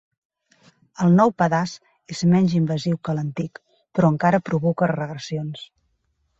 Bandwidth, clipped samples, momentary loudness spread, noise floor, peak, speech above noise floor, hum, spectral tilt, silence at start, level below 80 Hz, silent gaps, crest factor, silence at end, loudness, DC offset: 7.8 kHz; under 0.1%; 14 LU; -70 dBFS; -4 dBFS; 49 dB; none; -7.5 dB/octave; 1 s; -60 dBFS; none; 18 dB; 0.75 s; -21 LUFS; under 0.1%